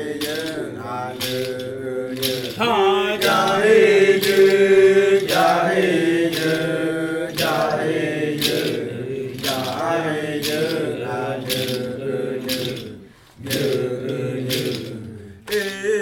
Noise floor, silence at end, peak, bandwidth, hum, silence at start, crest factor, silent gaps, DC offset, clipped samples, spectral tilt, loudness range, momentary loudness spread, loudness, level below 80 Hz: -42 dBFS; 0 s; -6 dBFS; 19 kHz; none; 0 s; 14 dB; none; under 0.1%; under 0.1%; -4.5 dB/octave; 10 LU; 14 LU; -20 LUFS; -56 dBFS